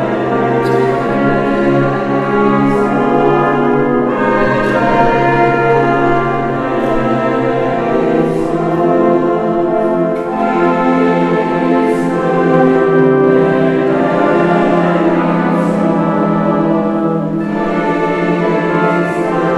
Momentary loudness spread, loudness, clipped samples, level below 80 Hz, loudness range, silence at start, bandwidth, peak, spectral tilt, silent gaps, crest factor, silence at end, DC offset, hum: 4 LU; -13 LUFS; under 0.1%; -38 dBFS; 2 LU; 0 s; 11 kHz; 0 dBFS; -8 dB/octave; none; 12 dB; 0 s; under 0.1%; none